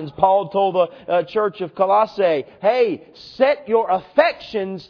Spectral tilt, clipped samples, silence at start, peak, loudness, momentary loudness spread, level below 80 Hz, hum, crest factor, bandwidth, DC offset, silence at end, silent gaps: -7 dB/octave; under 0.1%; 0 s; 0 dBFS; -19 LUFS; 6 LU; -60 dBFS; none; 18 dB; 5.4 kHz; under 0.1%; 0.05 s; none